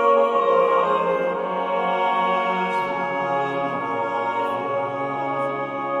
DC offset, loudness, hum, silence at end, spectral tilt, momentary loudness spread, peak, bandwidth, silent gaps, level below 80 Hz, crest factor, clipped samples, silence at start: under 0.1%; -22 LUFS; none; 0 s; -6 dB/octave; 7 LU; -6 dBFS; 8.4 kHz; none; -66 dBFS; 16 dB; under 0.1%; 0 s